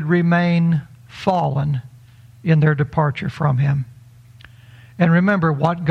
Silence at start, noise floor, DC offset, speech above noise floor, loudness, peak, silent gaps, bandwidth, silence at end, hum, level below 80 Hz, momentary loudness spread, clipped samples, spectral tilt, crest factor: 0 s; -45 dBFS; under 0.1%; 28 dB; -18 LUFS; -4 dBFS; none; 6.2 kHz; 0 s; none; -52 dBFS; 9 LU; under 0.1%; -9 dB/octave; 16 dB